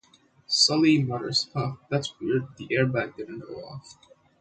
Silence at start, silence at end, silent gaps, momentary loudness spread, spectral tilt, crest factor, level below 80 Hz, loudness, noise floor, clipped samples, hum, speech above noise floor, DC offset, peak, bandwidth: 0.5 s; 0.5 s; none; 19 LU; -4.5 dB/octave; 20 dB; -64 dBFS; -25 LUFS; -56 dBFS; under 0.1%; none; 30 dB; under 0.1%; -6 dBFS; 9.2 kHz